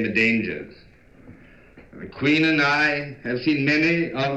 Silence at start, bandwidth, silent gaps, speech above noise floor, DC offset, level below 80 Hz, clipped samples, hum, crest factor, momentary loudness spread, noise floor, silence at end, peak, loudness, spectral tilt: 0 s; 8.2 kHz; none; 27 dB; 0.1%; -54 dBFS; under 0.1%; none; 16 dB; 17 LU; -49 dBFS; 0 s; -8 dBFS; -20 LUFS; -6 dB/octave